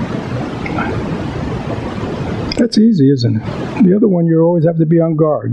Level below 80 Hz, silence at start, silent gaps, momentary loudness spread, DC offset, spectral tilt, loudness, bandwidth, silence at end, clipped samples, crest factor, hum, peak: -38 dBFS; 0 s; none; 10 LU; under 0.1%; -8 dB/octave; -14 LUFS; 9.2 kHz; 0 s; under 0.1%; 12 dB; none; -2 dBFS